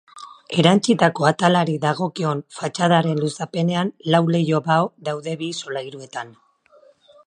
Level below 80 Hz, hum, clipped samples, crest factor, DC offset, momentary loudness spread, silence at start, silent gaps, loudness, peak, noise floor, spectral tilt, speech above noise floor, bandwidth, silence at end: -66 dBFS; none; under 0.1%; 20 dB; under 0.1%; 15 LU; 0.15 s; none; -20 LUFS; 0 dBFS; -54 dBFS; -5.5 dB/octave; 34 dB; 10 kHz; 0.95 s